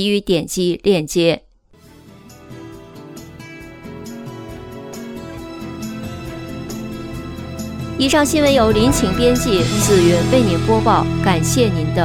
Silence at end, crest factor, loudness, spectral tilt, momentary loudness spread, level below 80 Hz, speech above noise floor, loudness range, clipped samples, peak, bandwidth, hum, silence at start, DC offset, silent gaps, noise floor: 0 s; 18 dB; -16 LUFS; -5 dB/octave; 22 LU; -34 dBFS; 33 dB; 19 LU; under 0.1%; 0 dBFS; 17.5 kHz; none; 0 s; under 0.1%; none; -48 dBFS